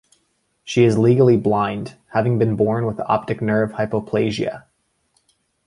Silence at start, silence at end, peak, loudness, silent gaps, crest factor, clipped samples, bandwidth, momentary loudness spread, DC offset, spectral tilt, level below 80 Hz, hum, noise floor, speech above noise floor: 0.65 s; 1.05 s; -2 dBFS; -19 LUFS; none; 18 dB; under 0.1%; 11 kHz; 10 LU; under 0.1%; -7.5 dB/octave; -52 dBFS; none; -67 dBFS; 49 dB